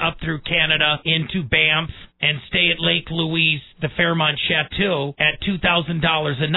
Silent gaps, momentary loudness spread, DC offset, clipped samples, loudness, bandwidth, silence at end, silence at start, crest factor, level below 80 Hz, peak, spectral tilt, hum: none; 5 LU; under 0.1%; under 0.1%; -18 LUFS; 4.1 kHz; 0 s; 0 s; 18 dB; -42 dBFS; -4 dBFS; -7.5 dB/octave; none